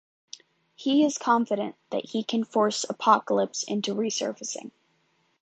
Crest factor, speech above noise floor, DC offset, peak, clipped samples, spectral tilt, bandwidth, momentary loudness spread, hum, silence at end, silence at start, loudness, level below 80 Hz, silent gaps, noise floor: 22 dB; 44 dB; under 0.1%; -6 dBFS; under 0.1%; -3.5 dB/octave; 9.2 kHz; 19 LU; none; 0.75 s; 0.8 s; -26 LUFS; -80 dBFS; none; -69 dBFS